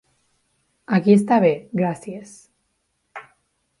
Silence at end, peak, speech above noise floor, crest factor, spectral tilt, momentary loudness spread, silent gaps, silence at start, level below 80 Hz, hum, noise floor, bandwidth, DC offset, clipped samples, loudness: 0.6 s; -4 dBFS; 53 dB; 20 dB; -7.5 dB/octave; 25 LU; none; 0.9 s; -66 dBFS; none; -71 dBFS; 11.5 kHz; under 0.1%; under 0.1%; -19 LUFS